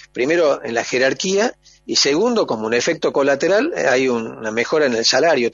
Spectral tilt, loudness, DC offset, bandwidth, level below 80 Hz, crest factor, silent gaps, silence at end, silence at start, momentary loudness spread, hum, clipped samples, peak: -3 dB/octave; -17 LUFS; under 0.1%; 7.8 kHz; -60 dBFS; 14 dB; none; 0 s; 0.15 s; 6 LU; none; under 0.1%; -2 dBFS